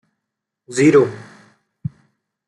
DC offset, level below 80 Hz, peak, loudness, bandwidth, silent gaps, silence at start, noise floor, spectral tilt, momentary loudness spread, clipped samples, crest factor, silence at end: under 0.1%; -60 dBFS; -2 dBFS; -15 LUFS; 11.5 kHz; none; 0.7 s; -80 dBFS; -6 dB/octave; 19 LU; under 0.1%; 18 dB; 1.3 s